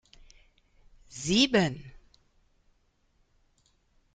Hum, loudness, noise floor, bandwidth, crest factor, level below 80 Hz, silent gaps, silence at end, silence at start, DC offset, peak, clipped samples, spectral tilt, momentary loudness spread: none; -26 LUFS; -69 dBFS; 9.6 kHz; 26 dB; -58 dBFS; none; 2.25 s; 1.15 s; under 0.1%; -8 dBFS; under 0.1%; -4 dB/octave; 22 LU